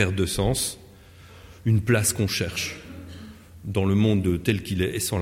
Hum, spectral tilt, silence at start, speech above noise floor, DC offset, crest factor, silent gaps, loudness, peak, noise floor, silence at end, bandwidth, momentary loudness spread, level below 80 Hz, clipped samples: none; -5 dB/octave; 0 s; 25 dB; under 0.1%; 18 dB; none; -24 LUFS; -8 dBFS; -48 dBFS; 0 s; 16.5 kHz; 20 LU; -44 dBFS; under 0.1%